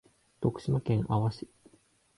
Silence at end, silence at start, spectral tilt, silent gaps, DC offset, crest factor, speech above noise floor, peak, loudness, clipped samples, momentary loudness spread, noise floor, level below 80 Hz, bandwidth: 0.75 s; 0.4 s; -9 dB/octave; none; under 0.1%; 18 dB; 36 dB; -14 dBFS; -31 LUFS; under 0.1%; 13 LU; -65 dBFS; -56 dBFS; 11.5 kHz